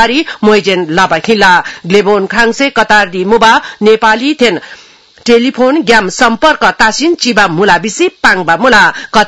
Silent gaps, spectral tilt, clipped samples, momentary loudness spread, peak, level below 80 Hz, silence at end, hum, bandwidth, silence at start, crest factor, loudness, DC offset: none; -3.5 dB/octave; 2%; 4 LU; 0 dBFS; -40 dBFS; 0 s; none; 12 kHz; 0 s; 8 dB; -8 LUFS; 0.5%